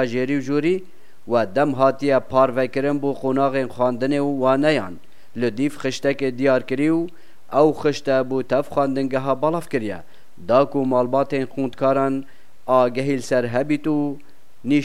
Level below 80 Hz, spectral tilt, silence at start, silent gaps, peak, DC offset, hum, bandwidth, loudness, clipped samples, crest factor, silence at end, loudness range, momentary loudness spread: -60 dBFS; -6.5 dB/octave; 0 s; none; -2 dBFS; 2%; none; 13 kHz; -21 LUFS; under 0.1%; 18 dB; 0 s; 2 LU; 8 LU